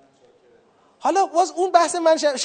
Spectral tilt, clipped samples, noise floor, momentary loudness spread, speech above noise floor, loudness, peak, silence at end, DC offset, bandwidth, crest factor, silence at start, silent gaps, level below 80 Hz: -1 dB/octave; under 0.1%; -56 dBFS; 4 LU; 38 dB; -19 LUFS; -2 dBFS; 0 s; under 0.1%; 9.4 kHz; 20 dB; 1.05 s; none; -80 dBFS